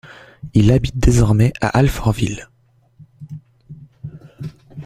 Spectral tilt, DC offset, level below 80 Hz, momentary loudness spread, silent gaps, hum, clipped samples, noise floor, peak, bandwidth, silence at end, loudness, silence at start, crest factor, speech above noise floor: -7 dB/octave; under 0.1%; -28 dBFS; 22 LU; none; none; under 0.1%; -55 dBFS; -2 dBFS; 15 kHz; 0 s; -16 LUFS; 0.45 s; 18 dB; 41 dB